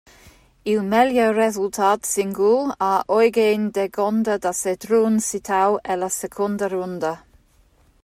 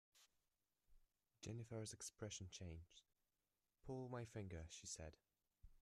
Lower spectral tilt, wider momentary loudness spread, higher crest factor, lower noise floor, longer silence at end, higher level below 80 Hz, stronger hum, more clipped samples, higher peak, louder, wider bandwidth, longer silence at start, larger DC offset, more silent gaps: about the same, -4.5 dB/octave vs -4.5 dB/octave; about the same, 8 LU vs 9 LU; about the same, 16 dB vs 18 dB; second, -57 dBFS vs under -90 dBFS; first, 0.85 s vs 0 s; first, -58 dBFS vs -72 dBFS; neither; neither; first, -4 dBFS vs -38 dBFS; first, -20 LUFS vs -54 LUFS; first, 15.5 kHz vs 13.5 kHz; first, 0.65 s vs 0.15 s; neither; neither